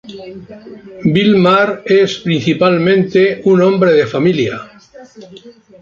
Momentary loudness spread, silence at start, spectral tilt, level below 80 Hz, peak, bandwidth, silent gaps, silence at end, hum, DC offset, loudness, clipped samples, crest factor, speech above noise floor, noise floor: 16 LU; 0.05 s; -7 dB/octave; -52 dBFS; -2 dBFS; 7.4 kHz; none; 0.3 s; none; under 0.1%; -12 LUFS; under 0.1%; 12 dB; 26 dB; -38 dBFS